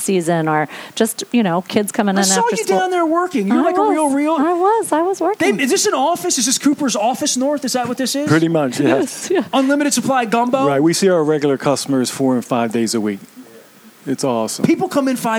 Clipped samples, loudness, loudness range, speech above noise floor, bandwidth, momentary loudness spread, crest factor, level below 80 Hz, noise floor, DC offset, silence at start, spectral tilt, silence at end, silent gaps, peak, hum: under 0.1%; -16 LUFS; 3 LU; 27 dB; 18.5 kHz; 5 LU; 16 dB; -64 dBFS; -43 dBFS; under 0.1%; 0 s; -4 dB/octave; 0 s; none; -2 dBFS; none